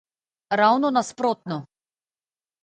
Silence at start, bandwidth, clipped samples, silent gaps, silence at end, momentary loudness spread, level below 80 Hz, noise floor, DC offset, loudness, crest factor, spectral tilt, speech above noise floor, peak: 0.5 s; 9.4 kHz; under 0.1%; none; 0.95 s; 14 LU; -76 dBFS; under -90 dBFS; under 0.1%; -22 LUFS; 20 dB; -5 dB/octave; over 69 dB; -6 dBFS